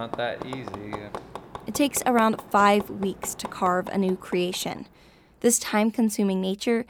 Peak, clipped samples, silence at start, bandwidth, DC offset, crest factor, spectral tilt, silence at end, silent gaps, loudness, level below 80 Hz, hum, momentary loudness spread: -8 dBFS; under 0.1%; 0 s; over 20 kHz; under 0.1%; 18 dB; -4 dB/octave; 0.05 s; none; -25 LUFS; -58 dBFS; none; 15 LU